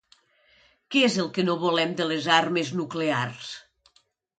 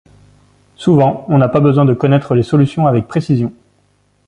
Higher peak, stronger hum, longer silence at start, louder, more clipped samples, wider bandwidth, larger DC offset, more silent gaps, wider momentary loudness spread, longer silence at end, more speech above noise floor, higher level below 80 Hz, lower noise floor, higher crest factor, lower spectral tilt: second, -6 dBFS vs -2 dBFS; second, none vs 50 Hz at -40 dBFS; about the same, 0.9 s vs 0.8 s; second, -24 LUFS vs -13 LUFS; neither; about the same, 9.4 kHz vs 9.4 kHz; neither; neither; first, 12 LU vs 6 LU; about the same, 0.8 s vs 0.75 s; about the same, 42 dB vs 45 dB; second, -72 dBFS vs -46 dBFS; first, -66 dBFS vs -57 dBFS; first, 20 dB vs 12 dB; second, -4.5 dB/octave vs -9 dB/octave